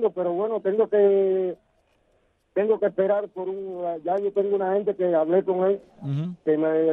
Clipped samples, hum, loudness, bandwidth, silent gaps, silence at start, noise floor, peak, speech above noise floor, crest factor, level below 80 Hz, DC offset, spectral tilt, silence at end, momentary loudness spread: under 0.1%; none; -24 LUFS; 3.9 kHz; none; 0 s; -66 dBFS; -10 dBFS; 43 dB; 14 dB; -70 dBFS; under 0.1%; -10 dB/octave; 0 s; 11 LU